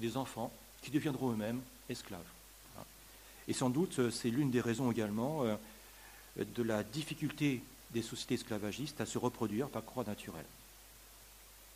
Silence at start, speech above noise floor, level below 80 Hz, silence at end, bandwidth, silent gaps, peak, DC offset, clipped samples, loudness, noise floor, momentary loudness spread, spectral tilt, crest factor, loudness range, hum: 0 s; 21 dB; -64 dBFS; 0 s; 15.5 kHz; none; -20 dBFS; under 0.1%; under 0.1%; -38 LUFS; -58 dBFS; 20 LU; -5.5 dB/octave; 20 dB; 5 LU; none